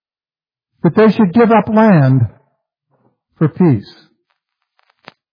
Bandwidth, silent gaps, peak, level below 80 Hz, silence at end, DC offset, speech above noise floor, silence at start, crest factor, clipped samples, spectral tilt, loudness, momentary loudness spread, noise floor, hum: 5.2 kHz; none; 0 dBFS; -54 dBFS; 1.5 s; under 0.1%; over 79 dB; 0.85 s; 14 dB; under 0.1%; -10.5 dB/octave; -12 LUFS; 9 LU; under -90 dBFS; none